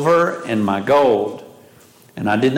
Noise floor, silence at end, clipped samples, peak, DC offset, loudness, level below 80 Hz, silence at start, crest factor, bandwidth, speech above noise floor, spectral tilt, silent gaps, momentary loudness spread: -48 dBFS; 0 s; under 0.1%; -6 dBFS; under 0.1%; -18 LUFS; -60 dBFS; 0 s; 12 dB; 16.5 kHz; 31 dB; -6.5 dB/octave; none; 15 LU